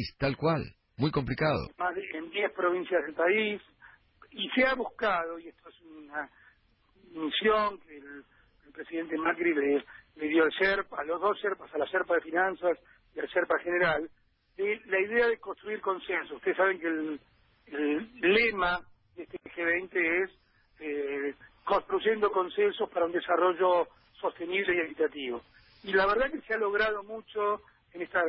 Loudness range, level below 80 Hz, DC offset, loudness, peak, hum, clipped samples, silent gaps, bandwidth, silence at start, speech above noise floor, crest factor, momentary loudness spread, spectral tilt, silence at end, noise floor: 4 LU; -60 dBFS; under 0.1%; -29 LUFS; -12 dBFS; none; under 0.1%; none; 5.8 kHz; 0 s; 37 dB; 18 dB; 15 LU; -9 dB/octave; 0 s; -66 dBFS